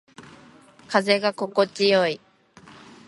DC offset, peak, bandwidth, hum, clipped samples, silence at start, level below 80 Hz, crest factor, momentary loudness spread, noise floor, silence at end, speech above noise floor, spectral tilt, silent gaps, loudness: under 0.1%; -4 dBFS; 11.5 kHz; none; under 0.1%; 0.2 s; -70 dBFS; 20 dB; 6 LU; -51 dBFS; 0.9 s; 30 dB; -4.5 dB/octave; none; -22 LUFS